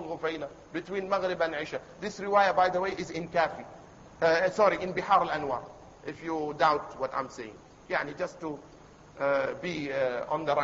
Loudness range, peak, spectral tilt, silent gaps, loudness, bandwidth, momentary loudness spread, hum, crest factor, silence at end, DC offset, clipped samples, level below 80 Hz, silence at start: 5 LU; -10 dBFS; -5 dB/octave; none; -29 LUFS; 7.8 kHz; 15 LU; none; 20 dB; 0 s; under 0.1%; under 0.1%; -62 dBFS; 0 s